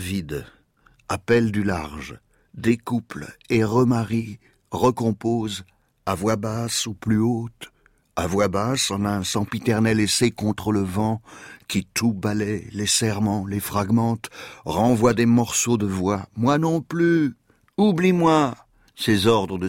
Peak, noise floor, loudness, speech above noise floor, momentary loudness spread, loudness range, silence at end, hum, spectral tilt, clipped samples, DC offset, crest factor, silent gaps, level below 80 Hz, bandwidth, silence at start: -6 dBFS; -59 dBFS; -22 LUFS; 37 dB; 15 LU; 4 LU; 0 s; none; -5 dB/octave; under 0.1%; under 0.1%; 16 dB; none; -50 dBFS; 16.5 kHz; 0 s